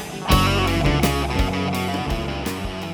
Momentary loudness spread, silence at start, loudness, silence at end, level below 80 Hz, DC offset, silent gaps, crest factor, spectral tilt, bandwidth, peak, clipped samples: 9 LU; 0 s; -21 LUFS; 0 s; -28 dBFS; under 0.1%; none; 18 dB; -5 dB/octave; over 20 kHz; -2 dBFS; under 0.1%